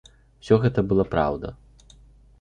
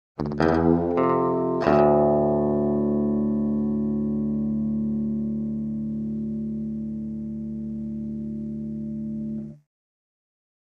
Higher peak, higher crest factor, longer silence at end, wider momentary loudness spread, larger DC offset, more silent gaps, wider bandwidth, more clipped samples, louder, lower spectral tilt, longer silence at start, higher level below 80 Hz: about the same, -4 dBFS vs -4 dBFS; about the same, 20 dB vs 20 dB; second, 0.85 s vs 1.1 s; about the same, 12 LU vs 12 LU; neither; neither; first, 9.4 kHz vs 6.4 kHz; neither; first, -22 LUFS vs -25 LUFS; second, -8.5 dB/octave vs -10 dB/octave; first, 0.45 s vs 0.2 s; about the same, -44 dBFS vs -46 dBFS